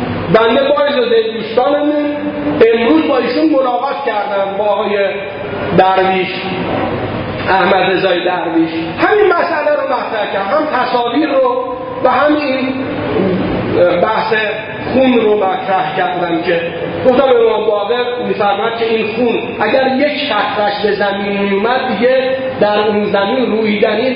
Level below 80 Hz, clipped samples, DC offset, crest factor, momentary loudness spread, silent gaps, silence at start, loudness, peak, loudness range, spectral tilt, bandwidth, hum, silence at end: -44 dBFS; under 0.1%; under 0.1%; 12 dB; 6 LU; none; 0 s; -13 LUFS; 0 dBFS; 1 LU; -9 dB/octave; 5.4 kHz; none; 0 s